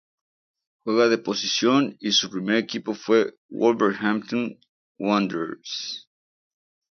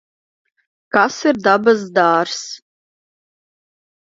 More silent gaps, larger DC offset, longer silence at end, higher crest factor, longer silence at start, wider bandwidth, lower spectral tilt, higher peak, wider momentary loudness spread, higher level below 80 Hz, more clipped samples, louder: first, 3.37-3.49 s, 4.69-4.95 s vs none; neither; second, 0.95 s vs 1.55 s; about the same, 18 dB vs 18 dB; about the same, 0.85 s vs 0.95 s; second, 6.8 kHz vs 7.8 kHz; about the same, -4 dB/octave vs -4 dB/octave; second, -6 dBFS vs 0 dBFS; second, 10 LU vs 13 LU; about the same, -70 dBFS vs -66 dBFS; neither; second, -23 LUFS vs -16 LUFS